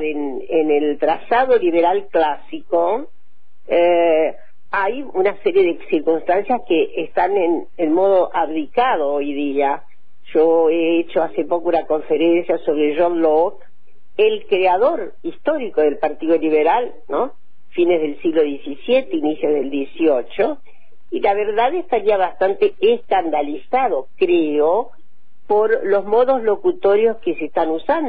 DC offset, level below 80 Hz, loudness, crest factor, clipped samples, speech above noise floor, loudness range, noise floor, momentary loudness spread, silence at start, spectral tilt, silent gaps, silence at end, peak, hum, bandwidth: 4%; -54 dBFS; -18 LUFS; 12 dB; under 0.1%; 49 dB; 2 LU; -66 dBFS; 7 LU; 0 s; -9 dB/octave; none; 0 s; -4 dBFS; none; 4.9 kHz